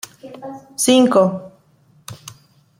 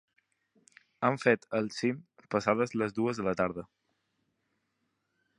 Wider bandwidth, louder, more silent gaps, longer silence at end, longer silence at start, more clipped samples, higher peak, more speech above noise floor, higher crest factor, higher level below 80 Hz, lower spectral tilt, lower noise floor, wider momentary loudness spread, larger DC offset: first, 16.5 kHz vs 11 kHz; first, -15 LUFS vs -31 LUFS; neither; second, 0.65 s vs 1.75 s; second, 0.25 s vs 1 s; neither; first, -2 dBFS vs -8 dBFS; second, 38 dB vs 50 dB; second, 18 dB vs 24 dB; about the same, -64 dBFS vs -68 dBFS; second, -4 dB/octave vs -6 dB/octave; second, -54 dBFS vs -80 dBFS; first, 24 LU vs 6 LU; neither